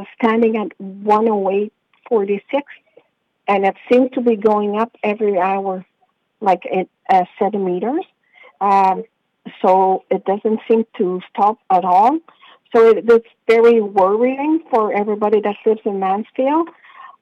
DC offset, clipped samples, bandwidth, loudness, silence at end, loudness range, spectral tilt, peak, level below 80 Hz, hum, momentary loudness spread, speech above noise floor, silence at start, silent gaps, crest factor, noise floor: under 0.1%; under 0.1%; 7 kHz; -17 LUFS; 0.15 s; 5 LU; -7.5 dB/octave; -4 dBFS; -66 dBFS; none; 10 LU; 48 dB; 0 s; none; 14 dB; -64 dBFS